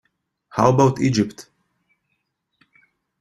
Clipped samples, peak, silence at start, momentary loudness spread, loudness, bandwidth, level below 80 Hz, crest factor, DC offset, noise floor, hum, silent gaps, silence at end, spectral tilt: under 0.1%; -2 dBFS; 0.55 s; 11 LU; -19 LUFS; 12 kHz; -54 dBFS; 22 dB; under 0.1%; -74 dBFS; none; none; 1.8 s; -6.5 dB/octave